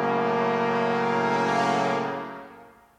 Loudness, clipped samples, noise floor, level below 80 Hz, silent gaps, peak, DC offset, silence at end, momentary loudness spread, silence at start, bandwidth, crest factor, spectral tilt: -24 LUFS; under 0.1%; -50 dBFS; -72 dBFS; none; -10 dBFS; under 0.1%; 0.3 s; 10 LU; 0 s; 11.5 kHz; 14 dB; -5.5 dB/octave